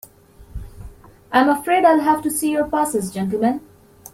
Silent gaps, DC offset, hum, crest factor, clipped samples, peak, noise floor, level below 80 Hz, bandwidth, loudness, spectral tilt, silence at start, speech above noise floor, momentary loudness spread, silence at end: none; under 0.1%; none; 18 dB; under 0.1%; -2 dBFS; -46 dBFS; -44 dBFS; 16.5 kHz; -18 LUFS; -4.5 dB/octave; 0.4 s; 29 dB; 22 LU; 0.05 s